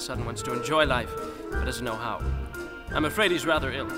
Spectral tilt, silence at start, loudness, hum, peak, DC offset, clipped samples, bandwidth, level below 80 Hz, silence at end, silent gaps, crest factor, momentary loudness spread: -4.5 dB/octave; 0 s; -27 LUFS; none; -6 dBFS; under 0.1%; under 0.1%; 16 kHz; -38 dBFS; 0 s; none; 22 dB; 11 LU